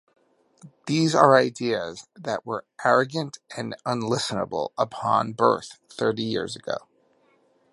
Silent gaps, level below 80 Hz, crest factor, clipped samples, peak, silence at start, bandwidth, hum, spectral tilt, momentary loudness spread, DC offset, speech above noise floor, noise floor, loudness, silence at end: none; -66 dBFS; 24 dB; under 0.1%; -2 dBFS; 0.65 s; 11.5 kHz; none; -5 dB/octave; 16 LU; under 0.1%; 39 dB; -63 dBFS; -24 LUFS; 0.95 s